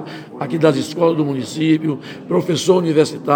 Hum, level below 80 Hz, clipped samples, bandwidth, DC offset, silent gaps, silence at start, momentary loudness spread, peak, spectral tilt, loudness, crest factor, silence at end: none; -68 dBFS; under 0.1%; 19 kHz; under 0.1%; none; 0 s; 10 LU; 0 dBFS; -6 dB/octave; -17 LUFS; 16 dB; 0 s